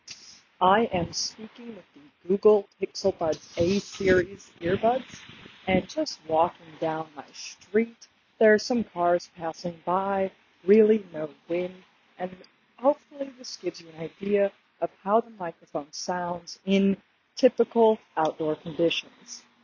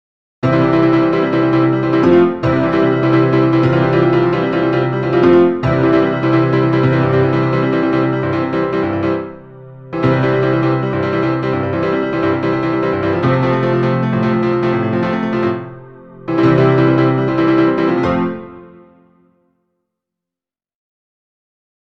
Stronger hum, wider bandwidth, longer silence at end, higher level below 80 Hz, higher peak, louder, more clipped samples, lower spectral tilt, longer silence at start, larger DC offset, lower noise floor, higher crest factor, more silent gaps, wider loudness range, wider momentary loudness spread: neither; first, 7.4 kHz vs 6.2 kHz; second, 0.25 s vs 3.25 s; second, -58 dBFS vs -44 dBFS; second, -6 dBFS vs 0 dBFS; second, -26 LUFS vs -14 LUFS; neither; second, -5 dB/octave vs -9 dB/octave; second, 0.1 s vs 0.45 s; second, under 0.1% vs 0.3%; second, -48 dBFS vs -89 dBFS; first, 20 dB vs 14 dB; neither; about the same, 4 LU vs 4 LU; first, 17 LU vs 6 LU